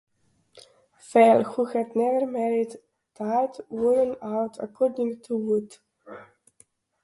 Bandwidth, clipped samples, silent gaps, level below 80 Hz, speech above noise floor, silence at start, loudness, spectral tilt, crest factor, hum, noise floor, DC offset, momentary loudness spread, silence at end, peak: 11.5 kHz; under 0.1%; none; -70 dBFS; 38 dB; 0.55 s; -24 LUFS; -6.5 dB/octave; 20 dB; none; -62 dBFS; under 0.1%; 16 LU; 0.8 s; -6 dBFS